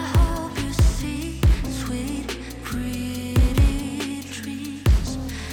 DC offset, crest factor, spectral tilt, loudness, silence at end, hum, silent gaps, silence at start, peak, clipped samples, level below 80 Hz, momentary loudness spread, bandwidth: under 0.1%; 14 dB; -5.5 dB/octave; -24 LUFS; 0 s; none; none; 0 s; -8 dBFS; under 0.1%; -24 dBFS; 10 LU; 19 kHz